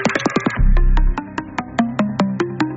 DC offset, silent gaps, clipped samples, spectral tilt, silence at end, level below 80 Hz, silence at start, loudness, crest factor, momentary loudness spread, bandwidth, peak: under 0.1%; none; under 0.1%; -5.5 dB/octave; 0 s; -18 dBFS; 0 s; -20 LUFS; 14 dB; 7 LU; 7.8 kHz; -2 dBFS